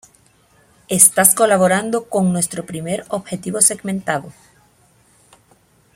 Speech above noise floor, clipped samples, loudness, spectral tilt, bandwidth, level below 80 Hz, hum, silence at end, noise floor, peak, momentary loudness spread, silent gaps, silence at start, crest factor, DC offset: 38 dB; under 0.1%; -15 LUFS; -3.5 dB/octave; 16.5 kHz; -58 dBFS; none; 1.65 s; -55 dBFS; 0 dBFS; 14 LU; none; 0.9 s; 20 dB; under 0.1%